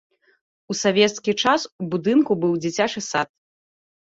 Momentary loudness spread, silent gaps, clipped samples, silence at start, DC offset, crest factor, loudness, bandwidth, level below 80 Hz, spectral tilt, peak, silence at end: 8 LU; 1.72-1.79 s; under 0.1%; 0.7 s; under 0.1%; 18 dB; -21 LUFS; 8 kHz; -64 dBFS; -4 dB/octave; -4 dBFS; 0.8 s